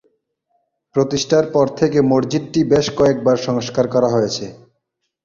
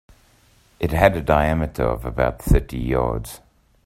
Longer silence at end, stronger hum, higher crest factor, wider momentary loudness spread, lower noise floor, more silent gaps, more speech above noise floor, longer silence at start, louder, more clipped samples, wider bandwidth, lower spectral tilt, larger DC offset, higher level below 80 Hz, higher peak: first, 0.7 s vs 0.5 s; neither; about the same, 16 dB vs 20 dB; second, 6 LU vs 11 LU; first, -74 dBFS vs -56 dBFS; neither; first, 57 dB vs 36 dB; first, 0.95 s vs 0.8 s; first, -17 LUFS vs -21 LUFS; neither; second, 7.6 kHz vs 16 kHz; second, -5.5 dB/octave vs -7 dB/octave; neither; second, -50 dBFS vs -28 dBFS; about the same, -2 dBFS vs 0 dBFS